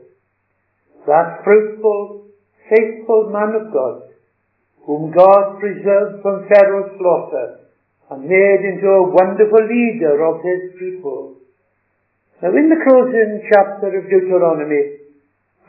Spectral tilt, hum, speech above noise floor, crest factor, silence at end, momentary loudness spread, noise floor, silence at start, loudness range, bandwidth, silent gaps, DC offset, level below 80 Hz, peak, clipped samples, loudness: -10 dB/octave; none; 53 dB; 16 dB; 0.7 s; 14 LU; -66 dBFS; 1.05 s; 4 LU; 5.4 kHz; none; under 0.1%; -68 dBFS; 0 dBFS; under 0.1%; -14 LUFS